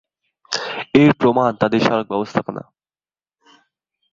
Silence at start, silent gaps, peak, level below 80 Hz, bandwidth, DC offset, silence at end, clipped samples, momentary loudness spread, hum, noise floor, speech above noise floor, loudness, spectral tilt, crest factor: 0.5 s; none; -2 dBFS; -54 dBFS; 7.6 kHz; under 0.1%; 1.55 s; under 0.1%; 12 LU; none; under -90 dBFS; over 74 dB; -17 LUFS; -6 dB/octave; 18 dB